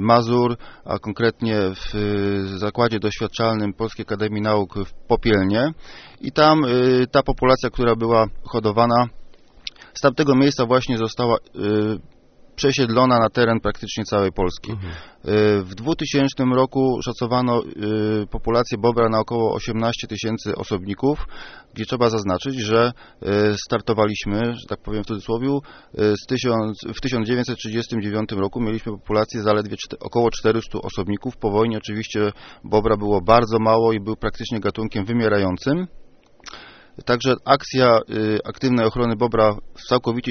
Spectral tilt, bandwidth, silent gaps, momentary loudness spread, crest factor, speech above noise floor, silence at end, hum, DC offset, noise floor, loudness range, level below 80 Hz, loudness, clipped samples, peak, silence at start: -5 dB/octave; 6.6 kHz; none; 11 LU; 20 dB; 24 dB; 0 s; none; under 0.1%; -44 dBFS; 4 LU; -40 dBFS; -20 LUFS; under 0.1%; 0 dBFS; 0 s